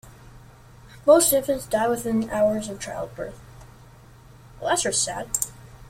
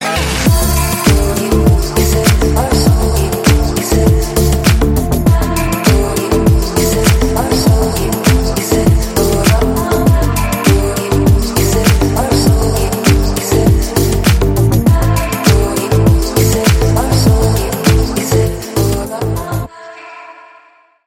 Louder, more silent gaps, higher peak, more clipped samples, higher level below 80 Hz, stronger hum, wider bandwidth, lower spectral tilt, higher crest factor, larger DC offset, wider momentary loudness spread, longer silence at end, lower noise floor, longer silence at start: second, -23 LUFS vs -12 LUFS; neither; second, -4 dBFS vs 0 dBFS; neither; second, -50 dBFS vs -16 dBFS; neither; about the same, 16.5 kHz vs 17 kHz; second, -3 dB/octave vs -5.5 dB/octave; first, 20 dB vs 12 dB; neither; first, 16 LU vs 4 LU; second, 0 s vs 0.75 s; about the same, -48 dBFS vs -46 dBFS; about the same, 0.05 s vs 0 s